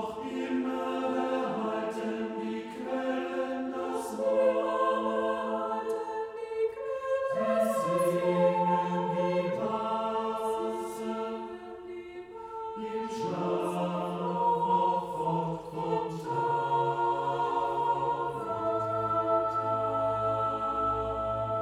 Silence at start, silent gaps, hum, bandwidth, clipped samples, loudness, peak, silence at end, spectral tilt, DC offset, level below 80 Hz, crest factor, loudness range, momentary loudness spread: 0 s; none; none; 15 kHz; under 0.1%; -30 LUFS; -14 dBFS; 0 s; -6.5 dB/octave; under 0.1%; -60 dBFS; 16 dB; 6 LU; 8 LU